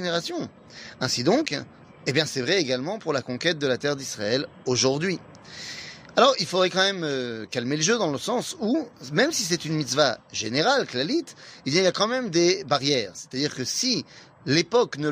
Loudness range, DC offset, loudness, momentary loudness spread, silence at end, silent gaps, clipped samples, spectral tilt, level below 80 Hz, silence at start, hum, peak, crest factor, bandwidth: 2 LU; under 0.1%; -24 LUFS; 12 LU; 0 s; none; under 0.1%; -3.5 dB/octave; -66 dBFS; 0 s; none; -6 dBFS; 20 dB; 15.5 kHz